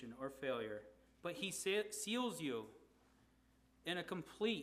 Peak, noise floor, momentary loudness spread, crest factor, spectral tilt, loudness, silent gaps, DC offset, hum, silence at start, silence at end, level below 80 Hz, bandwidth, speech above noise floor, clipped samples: -26 dBFS; -73 dBFS; 10 LU; 18 dB; -3.5 dB/octave; -43 LUFS; none; under 0.1%; none; 0 s; 0 s; -76 dBFS; 15.5 kHz; 30 dB; under 0.1%